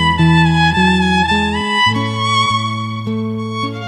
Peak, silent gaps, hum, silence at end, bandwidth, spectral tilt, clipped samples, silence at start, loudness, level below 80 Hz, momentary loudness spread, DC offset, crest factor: 0 dBFS; none; none; 0 s; 10 kHz; -5 dB/octave; under 0.1%; 0 s; -14 LUFS; -34 dBFS; 10 LU; under 0.1%; 14 dB